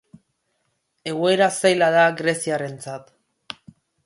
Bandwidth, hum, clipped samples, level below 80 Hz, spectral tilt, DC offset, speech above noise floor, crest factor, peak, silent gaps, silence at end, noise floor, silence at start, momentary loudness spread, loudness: 11.5 kHz; none; under 0.1%; -70 dBFS; -4 dB/octave; under 0.1%; 52 dB; 18 dB; -4 dBFS; none; 1.05 s; -72 dBFS; 1.05 s; 21 LU; -19 LUFS